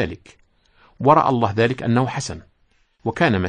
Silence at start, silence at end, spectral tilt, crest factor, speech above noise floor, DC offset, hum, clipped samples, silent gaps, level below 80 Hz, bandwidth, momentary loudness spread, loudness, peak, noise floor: 0 s; 0 s; -6 dB/octave; 18 dB; 42 dB; under 0.1%; none; under 0.1%; none; -52 dBFS; 10 kHz; 15 LU; -20 LUFS; -2 dBFS; -61 dBFS